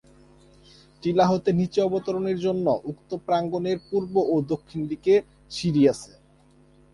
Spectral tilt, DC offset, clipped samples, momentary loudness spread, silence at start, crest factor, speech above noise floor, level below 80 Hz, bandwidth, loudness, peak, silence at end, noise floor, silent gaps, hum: -7 dB/octave; under 0.1%; under 0.1%; 10 LU; 1.05 s; 18 dB; 33 dB; -58 dBFS; 11.5 kHz; -24 LUFS; -8 dBFS; 0.9 s; -57 dBFS; none; none